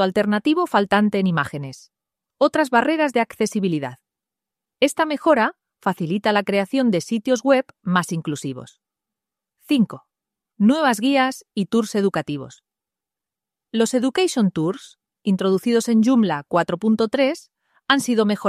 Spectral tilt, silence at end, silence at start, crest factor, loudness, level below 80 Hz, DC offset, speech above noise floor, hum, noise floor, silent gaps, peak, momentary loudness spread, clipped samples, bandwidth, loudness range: -5.5 dB/octave; 0 s; 0 s; 18 dB; -20 LUFS; -64 dBFS; under 0.1%; 69 dB; none; -88 dBFS; none; -2 dBFS; 10 LU; under 0.1%; 14.5 kHz; 3 LU